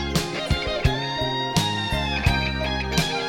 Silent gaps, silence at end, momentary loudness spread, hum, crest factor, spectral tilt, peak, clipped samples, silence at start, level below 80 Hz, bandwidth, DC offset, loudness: none; 0 s; 3 LU; none; 20 dB; -4.5 dB/octave; -4 dBFS; under 0.1%; 0 s; -32 dBFS; 16.5 kHz; under 0.1%; -23 LUFS